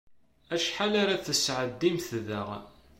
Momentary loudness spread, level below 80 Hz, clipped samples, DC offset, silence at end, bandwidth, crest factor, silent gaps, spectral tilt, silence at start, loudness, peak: 9 LU; -62 dBFS; under 0.1%; under 0.1%; 0.3 s; 16.5 kHz; 18 dB; none; -3.5 dB/octave; 0.5 s; -29 LUFS; -14 dBFS